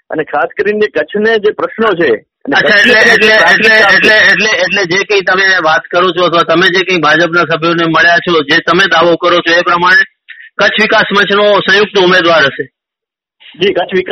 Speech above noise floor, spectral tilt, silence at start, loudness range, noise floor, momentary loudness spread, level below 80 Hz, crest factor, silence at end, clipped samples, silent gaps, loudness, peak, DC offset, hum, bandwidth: 74 dB; -4 dB/octave; 0.1 s; 3 LU; -83 dBFS; 9 LU; -50 dBFS; 8 dB; 0 s; 0.4%; none; -8 LUFS; 0 dBFS; under 0.1%; none; 14 kHz